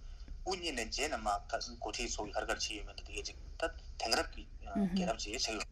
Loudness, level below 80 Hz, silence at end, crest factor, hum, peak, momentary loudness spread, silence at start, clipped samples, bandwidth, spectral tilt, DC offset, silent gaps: -38 LUFS; -48 dBFS; 0 s; 24 dB; none; -14 dBFS; 10 LU; 0 s; under 0.1%; 15.5 kHz; -3 dB/octave; under 0.1%; none